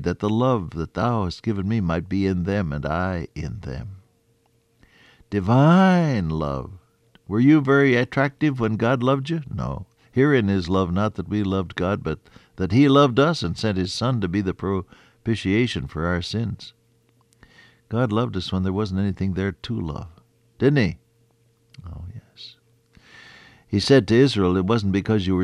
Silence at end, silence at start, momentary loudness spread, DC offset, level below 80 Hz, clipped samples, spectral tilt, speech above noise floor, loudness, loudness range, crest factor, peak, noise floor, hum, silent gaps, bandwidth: 0 s; 0 s; 16 LU; under 0.1%; -46 dBFS; under 0.1%; -7 dB/octave; 42 dB; -22 LUFS; 7 LU; 18 dB; -4 dBFS; -63 dBFS; none; none; 11 kHz